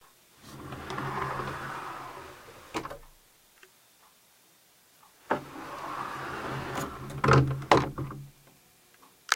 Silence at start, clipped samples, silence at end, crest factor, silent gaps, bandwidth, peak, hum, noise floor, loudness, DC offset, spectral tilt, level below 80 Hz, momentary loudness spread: 0.4 s; under 0.1%; 0 s; 30 dB; none; 16 kHz; -2 dBFS; none; -62 dBFS; -31 LUFS; under 0.1%; -5.5 dB/octave; -52 dBFS; 23 LU